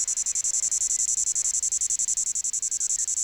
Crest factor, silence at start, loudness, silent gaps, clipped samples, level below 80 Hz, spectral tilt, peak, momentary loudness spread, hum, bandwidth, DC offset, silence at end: 12 dB; 0 s; -23 LUFS; none; under 0.1%; -60 dBFS; 3 dB/octave; -14 dBFS; 3 LU; none; over 20 kHz; under 0.1%; 0 s